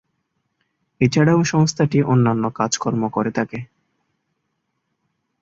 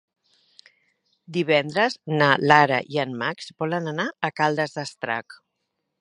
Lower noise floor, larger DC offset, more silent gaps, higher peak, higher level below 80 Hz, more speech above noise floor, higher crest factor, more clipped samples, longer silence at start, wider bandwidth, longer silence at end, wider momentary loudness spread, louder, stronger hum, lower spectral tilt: second, -73 dBFS vs -78 dBFS; neither; neither; about the same, -2 dBFS vs 0 dBFS; first, -56 dBFS vs -72 dBFS; about the same, 56 dB vs 55 dB; second, 18 dB vs 24 dB; neither; second, 1 s vs 1.3 s; second, 7.8 kHz vs 11 kHz; first, 1.75 s vs 0.65 s; second, 8 LU vs 12 LU; first, -19 LUFS vs -22 LUFS; neither; about the same, -6 dB/octave vs -5.5 dB/octave